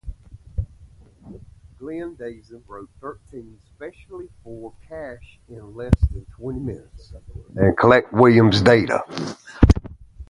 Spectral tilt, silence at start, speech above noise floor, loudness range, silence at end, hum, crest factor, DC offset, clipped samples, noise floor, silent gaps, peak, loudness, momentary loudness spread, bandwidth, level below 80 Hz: -7 dB/octave; 0.05 s; 27 dB; 20 LU; 0.05 s; none; 22 dB; under 0.1%; under 0.1%; -48 dBFS; none; 0 dBFS; -18 LUFS; 26 LU; 11.5 kHz; -32 dBFS